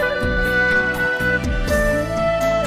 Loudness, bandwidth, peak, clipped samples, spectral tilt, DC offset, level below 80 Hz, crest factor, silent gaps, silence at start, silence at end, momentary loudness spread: -18 LUFS; 15.5 kHz; -8 dBFS; under 0.1%; -5 dB/octave; under 0.1%; -28 dBFS; 12 dB; none; 0 s; 0 s; 4 LU